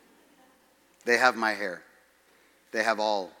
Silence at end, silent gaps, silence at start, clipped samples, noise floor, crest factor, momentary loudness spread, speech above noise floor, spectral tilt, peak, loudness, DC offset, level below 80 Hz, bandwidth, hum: 0.1 s; none; 1.05 s; under 0.1%; -63 dBFS; 24 dB; 14 LU; 36 dB; -2.5 dB/octave; -6 dBFS; -27 LUFS; under 0.1%; -84 dBFS; 18 kHz; none